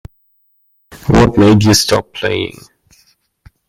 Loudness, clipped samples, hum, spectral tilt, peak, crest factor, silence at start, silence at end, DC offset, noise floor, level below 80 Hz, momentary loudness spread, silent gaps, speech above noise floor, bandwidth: -11 LUFS; under 0.1%; none; -5 dB/octave; 0 dBFS; 14 dB; 0.9 s; 1.2 s; under 0.1%; -58 dBFS; -32 dBFS; 13 LU; none; 47 dB; 16 kHz